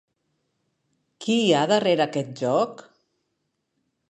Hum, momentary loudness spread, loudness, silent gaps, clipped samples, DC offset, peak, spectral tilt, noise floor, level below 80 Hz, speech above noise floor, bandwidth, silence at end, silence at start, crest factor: none; 8 LU; -22 LUFS; none; under 0.1%; under 0.1%; -6 dBFS; -5 dB/octave; -76 dBFS; -76 dBFS; 55 dB; 10 kHz; 1.35 s; 1.2 s; 20 dB